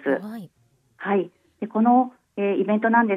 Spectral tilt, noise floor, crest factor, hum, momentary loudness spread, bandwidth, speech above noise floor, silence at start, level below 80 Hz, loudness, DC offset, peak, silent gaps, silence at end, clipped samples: -9 dB/octave; -64 dBFS; 16 dB; none; 17 LU; 4.2 kHz; 45 dB; 0.05 s; -78 dBFS; -22 LUFS; under 0.1%; -6 dBFS; none; 0 s; under 0.1%